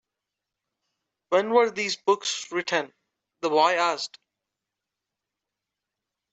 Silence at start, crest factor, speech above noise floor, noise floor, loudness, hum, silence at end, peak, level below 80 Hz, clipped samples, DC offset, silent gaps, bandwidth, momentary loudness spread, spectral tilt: 1.3 s; 22 dB; 62 dB; -86 dBFS; -24 LUFS; none; 2.25 s; -6 dBFS; -80 dBFS; under 0.1%; under 0.1%; none; 8.2 kHz; 11 LU; -2.5 dB/octave